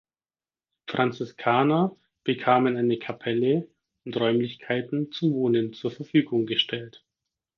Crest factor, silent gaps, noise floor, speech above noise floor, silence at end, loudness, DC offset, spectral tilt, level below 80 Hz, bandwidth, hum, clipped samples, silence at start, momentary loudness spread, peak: 22 dB; none; under -90 dBFS; over 65 dB; 0.7 s; -25 LUFS; under 0.1%; -7.5 dB/octave; -72 dBFS; 6.6 kHz; none; under 0.1%; 0.85 s; 12 LU; -4 dBFS